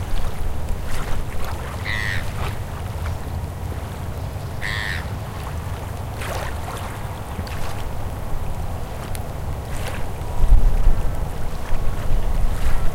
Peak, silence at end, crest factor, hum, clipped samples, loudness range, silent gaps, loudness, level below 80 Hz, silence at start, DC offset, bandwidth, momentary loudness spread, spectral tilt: -2 dBFS; 0 s; 16 dB; none; under 0.1%; 4 LU; none; -27 LUFS; -22 dBFS; 0 s; under 0.1%; 16 kHz; 6 LU; -5.5 dB/octave